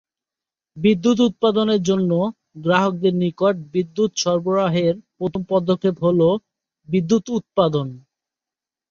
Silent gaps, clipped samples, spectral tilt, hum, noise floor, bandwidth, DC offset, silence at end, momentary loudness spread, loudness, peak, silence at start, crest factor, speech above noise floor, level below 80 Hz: none; under 0.1%; -6 dB/octave; none; -89 dBFS; 7.4 kHz; under 0.1%; 0.9 s; 8 LU; -20 LUFS; -2 dBFS; 0.75 s; 18 dB; 70 dB; -58 dBFS